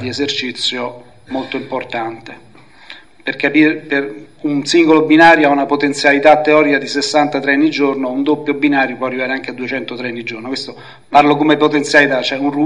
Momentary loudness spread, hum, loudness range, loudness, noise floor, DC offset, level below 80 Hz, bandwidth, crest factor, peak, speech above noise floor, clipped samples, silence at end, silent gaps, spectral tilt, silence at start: 14 LU; none; 8 LU; -14 LUFS; -39 dBFS; 0.5%; -58 dBFS; 10.5 kHz; 14 dB; 0 dBFS; 25 dB; 0.1%; 0 s; none; -4.5 dB/octave; 0 s